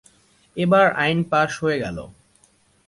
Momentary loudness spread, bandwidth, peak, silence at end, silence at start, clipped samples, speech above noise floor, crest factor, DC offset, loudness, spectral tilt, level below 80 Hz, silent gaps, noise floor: 16 LU; 11.5 kHz; -4 dBFS; 0.75 s; 0.55 s; under 0.1%; 40 dB; 18 dB; under 0.1%; -20 LUFS; -6 dB/octave; -54 dBFS; none; -59 dBFS